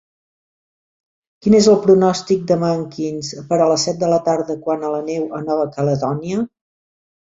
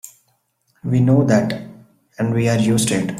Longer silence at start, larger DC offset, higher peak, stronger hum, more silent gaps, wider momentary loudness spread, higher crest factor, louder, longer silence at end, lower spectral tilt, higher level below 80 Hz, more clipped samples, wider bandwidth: first, 1.45 s vs 0.05 s; neither; about the same, 0 dBFS vs -2 dBFS; neither; neither; about the same, 12 LU vs 11 LU; about the same, 18 dB vs 16 dB; about the same, -17 LUFS vs -17 LUFS; first, 0.75 s vs 0 s; about the same, -6 dB/octave vs -6 dB/octave; about the same, -56 dBFS vs -52 dBFS; neither; second, 7.8 kHz vs 15 kHz